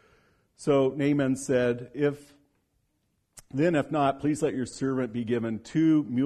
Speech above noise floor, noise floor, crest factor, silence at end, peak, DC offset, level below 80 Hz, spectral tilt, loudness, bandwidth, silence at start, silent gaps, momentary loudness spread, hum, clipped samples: 48 dB; -74 dBFS; 16 dB; 0 s; -12 dBFS; under 0.1%; -62 dBFS; -6.5 dB/octave; -27 LUFS; 12.5 kHz; 0.6 s; none; 6 LU; none; under 0.1%